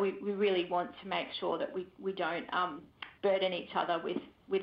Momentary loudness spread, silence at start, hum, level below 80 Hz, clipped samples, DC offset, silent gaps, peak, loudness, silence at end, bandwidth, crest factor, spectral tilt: 8 LU; 0 s; none; -74 dBFS; under 0.1%; under 0.1%; none; -18 dBFS; -34 LUFS; 0 s; 5.4 kHz; 16 dB; -7.5 dB/octave